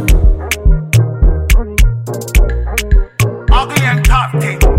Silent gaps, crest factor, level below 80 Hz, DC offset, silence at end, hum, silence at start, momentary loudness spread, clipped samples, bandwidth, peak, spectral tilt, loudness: none; 10 dB; -12 dBFS; under 0.1%; 0 s; none; 0 s; 4 LU; under 0.1%; 16.5 kHz; 0 dBFS; -5 dB/octave; -13 LUFS